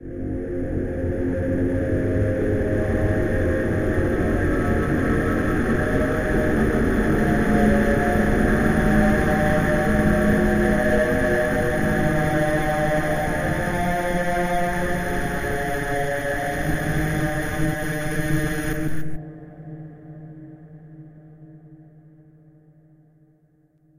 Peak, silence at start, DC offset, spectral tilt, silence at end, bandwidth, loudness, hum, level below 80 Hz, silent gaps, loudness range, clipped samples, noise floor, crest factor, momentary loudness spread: -6 dBFS; 0 s; under 0.1%; -7 dB/octave; 2.15 s; 15 kHz; -22 LUFS; none; -32 dBFS; none; 8 LU; under 0.1%; -60 dBFS; 16 dB; 9 LU